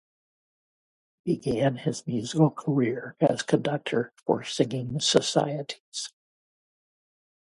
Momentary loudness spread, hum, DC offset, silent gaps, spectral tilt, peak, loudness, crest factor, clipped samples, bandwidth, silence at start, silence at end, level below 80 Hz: 12 LU; none; under 0.1%; 5.80-5.92 s; -5 dB/octave; -4 dBFS; -27 LUFS; 24 dB; under 0.1%; 11.5 kHz; 1.25 s; 1.4 s; -62 dBFS